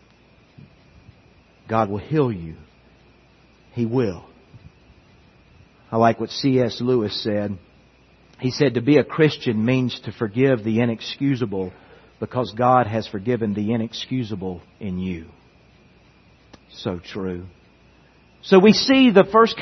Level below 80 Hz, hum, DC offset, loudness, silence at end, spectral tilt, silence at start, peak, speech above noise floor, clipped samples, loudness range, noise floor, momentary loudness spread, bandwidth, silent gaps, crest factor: -58 dBFS; none; under 0.1%; -20 LUFS; 0 s; -6.5 dB/octave; 1.7 s; -2 dBFS; 34 dB; under 0.1%; 11 LU; -54 dBFS; 17 LU; 6.4 kHz; none; 20 dB